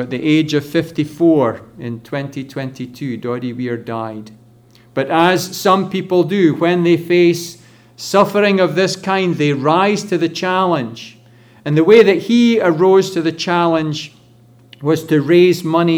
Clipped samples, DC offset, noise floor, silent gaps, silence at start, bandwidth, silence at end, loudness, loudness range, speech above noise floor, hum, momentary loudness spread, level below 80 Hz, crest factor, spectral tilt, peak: under 0.1%; under 0.1%; -47 dBFS; none; 0 s; 19 kHz; 0 s; -15 LUFS; 7 LU; 32 dB; none; 15 LU; -60 dBFS; 16 dB; -6 dB/octave; 0 dBFS